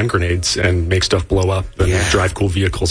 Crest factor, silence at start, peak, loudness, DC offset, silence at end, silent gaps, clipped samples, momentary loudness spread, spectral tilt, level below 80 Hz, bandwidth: 12 dB; 0 s; -4 dBFS; -16 LUFS; under 0.1%; 0 s; none; under 0.1%; 3 LU; -4.5 dB/octave; -28 dBFS; 10.5 kHz